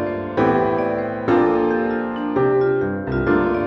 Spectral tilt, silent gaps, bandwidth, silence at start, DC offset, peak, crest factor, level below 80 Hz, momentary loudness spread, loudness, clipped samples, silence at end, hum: -9 dB/octave; none; 6 kHz; 0 s; under 0.1%; -6 dBFS; 14 dB; -42 dBFS; 5 LU; -19 LUFS; under 0.1%; 0 s; none